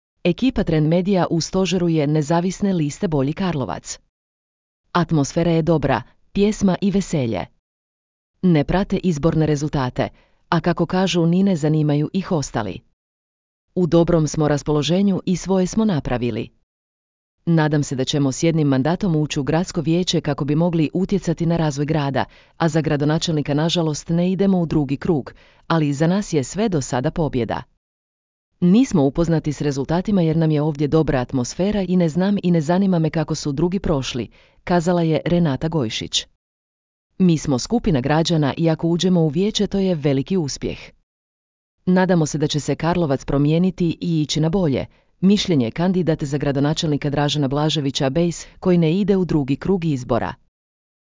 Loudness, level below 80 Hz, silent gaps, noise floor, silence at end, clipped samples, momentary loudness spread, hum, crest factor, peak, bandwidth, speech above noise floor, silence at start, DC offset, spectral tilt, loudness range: -20 LUFS; -42 dBFS; 4.09-4.84 s, 7.59-8.34 s, 12.93-13.68 s, 16.63-17.38 s, 27.77-28.52 s, 36.35-37.10 s, 41.03-41.78 s; under -90 dBFS; 0.8 s; under 0.1%; 6 LU; none; 18 dB; -2 dBFS; 7.6 kHz; over 71 dB; 0.25 s; under 0.1%; -6.5 dB/octave; 2 LU